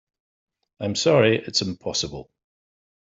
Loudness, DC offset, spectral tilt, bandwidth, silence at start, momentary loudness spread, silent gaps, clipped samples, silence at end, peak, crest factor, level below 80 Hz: -22 LUFS; under 0.1%; -4 dB/octave; 8.2 kHz; 0.8 s; 14 LU; none; under 0.1%; 0.85 s; -4 dBFS; 20 dB; -56 dBFS